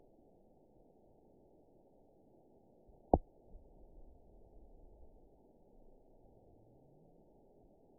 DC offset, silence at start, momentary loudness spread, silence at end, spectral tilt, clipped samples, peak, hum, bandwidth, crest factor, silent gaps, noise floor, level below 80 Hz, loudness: under 0.1%; 3.15 s; 12 LU; 3.95 s; 0.5 dB/octave; under 0.1%; -8 dBFS; none; 1 kHz; 38 dB; none; -67 dBFS; -56 dBFS; -36 LUFS